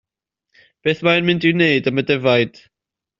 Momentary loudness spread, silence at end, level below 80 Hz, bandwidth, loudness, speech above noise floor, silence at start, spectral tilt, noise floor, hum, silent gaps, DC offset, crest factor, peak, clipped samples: 7 LU; 0.7 s; -58 dBFS; 7.4 kHz; -17 LUFS; 69 dB; 0.85 s; -4 dB/octave; -86 dBFS; none; none; under 0.1%; 18 dB; -2 dBFS; under 0.1%